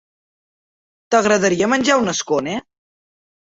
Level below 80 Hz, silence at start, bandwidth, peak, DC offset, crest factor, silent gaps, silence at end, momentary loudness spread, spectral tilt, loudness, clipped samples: -58 dBFS; 1.1 s; 8.2 kHz; -2 dBFS; under 0.1%; 18 dB; none; 1 s; 8 LU; -3.5 dB/octave; -17 LUFS; under 0.1%